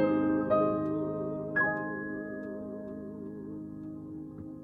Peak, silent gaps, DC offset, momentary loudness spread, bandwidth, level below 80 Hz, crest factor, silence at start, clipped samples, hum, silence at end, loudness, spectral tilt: -16 dBFS; none; under 0.1%; 15 LU; 4.5 kHz; -62 dBFS; 18 dB; 0 s; under 0.1%; none; 0 s; -33 LUFS; -10 dB/octave